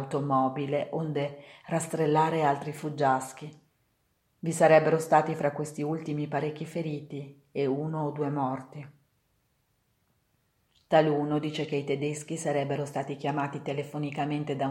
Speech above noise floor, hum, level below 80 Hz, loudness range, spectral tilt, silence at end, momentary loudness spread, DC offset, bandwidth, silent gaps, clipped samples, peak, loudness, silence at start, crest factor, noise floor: 45 dB; none; -74 dBFS; 7 LU; -6 dB/octave; 0 s; 12 LU; under 0.1%; 14.5 kHz; none; under 0.1%; -6 dBFS; -29 LUFS; 0 s; 22 dB; -73 dBFS